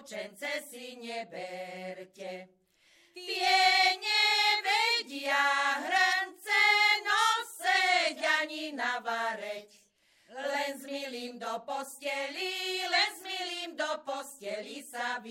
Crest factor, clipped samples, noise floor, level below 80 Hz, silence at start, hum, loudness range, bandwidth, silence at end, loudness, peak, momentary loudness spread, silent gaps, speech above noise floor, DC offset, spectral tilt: 20 dB; under 0.1%; -67 dBFS; under -90 dBFS; 0 s; none; 11 LU; 16.5 kHz; 0 s; -28 LUFS; -12 dBFS; 17 LU; none; 31 dB; under 0.1%; 0 dB/octave